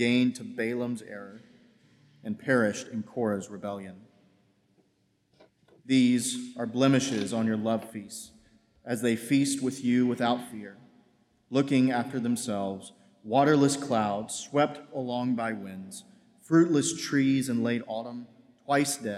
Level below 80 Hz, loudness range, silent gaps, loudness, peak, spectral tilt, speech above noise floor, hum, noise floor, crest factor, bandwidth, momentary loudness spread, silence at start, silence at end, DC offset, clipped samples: -76 dBFS; 5 LU; none; -28 LUFS; -10 dBFS; -5 dB/octave; 43 dB; none; -71 dBFS; 18 dB; 14.5 kHz; 18 LU; 0 s; 0 s; under 0.1%; under 0.1%